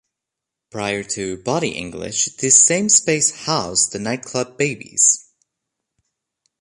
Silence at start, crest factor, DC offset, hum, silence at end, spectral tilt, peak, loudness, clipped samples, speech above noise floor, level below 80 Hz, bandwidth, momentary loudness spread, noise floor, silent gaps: 0.75 s; 20 dB; under 0.1%; none; 1.4 s; -2 dB/octave; 0 dBFS; -17 LUFS; under 0.1%; 65 dB; -56 dBFS; 11.5 kHz; 14 LU; -84 dBFS; none